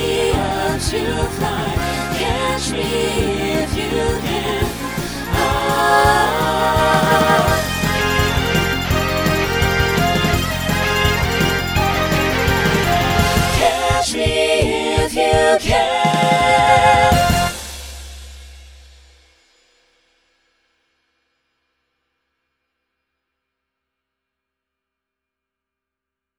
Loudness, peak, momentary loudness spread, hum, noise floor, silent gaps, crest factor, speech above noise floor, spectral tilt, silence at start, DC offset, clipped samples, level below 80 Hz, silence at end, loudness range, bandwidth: -16 LUFS; 0 dBFS; 7 LU; none; -84 dBFS; none; 18 dB; 66 dB; -4.5 dB/octave; 0 s; under 0.1%; under 0.1%; -30 dBFS; 7.7 s; 5 LU; over 20 kHz